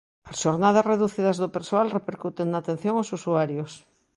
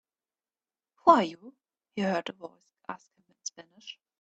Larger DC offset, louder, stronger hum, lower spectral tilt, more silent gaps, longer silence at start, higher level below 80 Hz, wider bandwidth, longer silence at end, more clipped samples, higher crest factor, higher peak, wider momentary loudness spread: neither; about the same, -25 LUFS vs -26 LUFS; neither; first, -6 dB/octave vs -4.5 dB/octave; neither; second, 0.25 s vs 1.05 s; first, -66 dBFS vs -74 dBFS; first, 11.5 kHz vs 8.2 kHz; about the same, 0.4 s vs 0.3 s; neither; second, 18 dB vs 26 dB; about the same, -8 dBFS vs -6 dBFS; second, 11 LU vs 24 LU